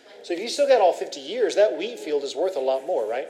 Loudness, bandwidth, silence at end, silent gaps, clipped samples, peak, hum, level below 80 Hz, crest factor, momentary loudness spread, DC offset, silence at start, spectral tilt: -23 LUFS; 14 kHz; 0 s; none; under 0.1%; -6 dBFS; none; under -90 dBFS; 18 dB; 12 LU; under 0.1%; 0.1 s; -2 dB/octave